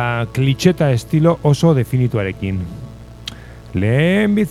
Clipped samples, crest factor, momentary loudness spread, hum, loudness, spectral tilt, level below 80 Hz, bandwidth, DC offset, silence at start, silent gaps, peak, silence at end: under 0.1%; 16 dB; 17 LU; none; -16 LUFS; -7 dB/octave; -40 dBFS; 14 kHz; under 0.1%; 0 s; none; 0 dBFS; 0 s